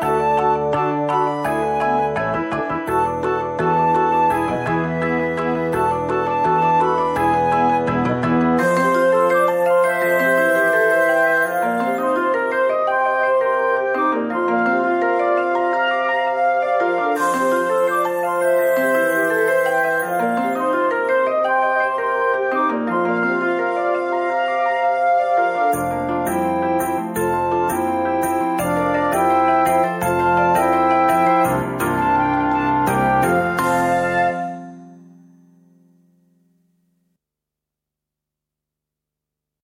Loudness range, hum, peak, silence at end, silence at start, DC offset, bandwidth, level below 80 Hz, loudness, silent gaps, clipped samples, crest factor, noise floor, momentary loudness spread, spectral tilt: 3 LU; 50 Hz at -65 dBFS; -6 dBFS; 4.65 s; 0 s; under 0.1%; 16.5 kHz; -50 dBFS; -18 LUFS; none; under 0.1%; 12 dB; -84 dBFS; 5 LU; -6 dB/octave